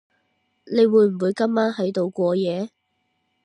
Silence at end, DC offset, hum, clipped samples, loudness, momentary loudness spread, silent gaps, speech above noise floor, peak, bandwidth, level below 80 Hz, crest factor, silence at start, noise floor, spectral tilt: 0.75 s; under 0.1%; none; under 0.1%; -21 LUFS; 9 LU; none; 52 dB; -6 dBFS; 10.5 kHz; -74 dBFS; 16 dB; 0.65 s; -72 dBFS; -7.5 dB/octave